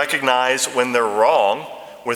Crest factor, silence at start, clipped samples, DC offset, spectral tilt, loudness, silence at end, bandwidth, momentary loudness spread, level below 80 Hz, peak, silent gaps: 18 dB; 0 s; under 0.1%; under 0.1%; -2 dB/octave; -17 LUFS; 0 s; 18 kHz; 12 LU; -70 dBFS; 0 dBFS; none